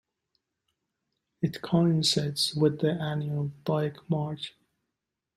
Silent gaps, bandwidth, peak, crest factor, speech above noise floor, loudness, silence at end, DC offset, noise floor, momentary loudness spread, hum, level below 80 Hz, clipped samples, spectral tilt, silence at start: none; 15 kHz; -12 dBFS; 18 dB; 58 dB; -28 LUFS; 0.9 s; under 0.1%; -86 dBFS; 9 LU; none; -66 dBFS; under 0.1%; -5.5 dB/octave; 1.4 s